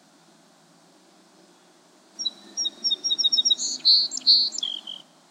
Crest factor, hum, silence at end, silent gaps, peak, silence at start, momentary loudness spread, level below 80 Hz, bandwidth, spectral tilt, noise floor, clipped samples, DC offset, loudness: 20 dB; none; 0.35 s; none; -6 dBFS; 2.2 s; 13 LU; under -90 dBFS; 15.5 kHz; 2 dB/octave; -56 dBFS; under 0.1%; under 0.1%; -20 LUFS